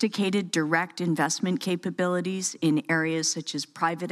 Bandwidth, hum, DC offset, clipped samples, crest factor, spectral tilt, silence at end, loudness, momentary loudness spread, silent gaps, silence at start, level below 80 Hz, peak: 14 kHz; none; under 0.1%; under 0.1%; 18 dB; -4 dB/octave; 0 s; -26 LUFS; 4 LU; none; 0 s; -78 dBFS; -10 dBFS